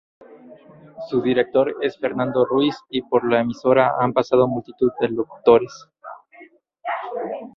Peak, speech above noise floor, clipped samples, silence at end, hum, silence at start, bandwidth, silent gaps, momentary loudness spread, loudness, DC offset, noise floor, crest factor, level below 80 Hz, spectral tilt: -2 dBFS; 29 dB; under 0.1%; 0.05 s; none; 0.3 s; 6.8 kHz; none; 17 LU; -20 LUFS; under 0.1%; -49 dBFS; 20 dB; -60 dBFS; -7 dB/octave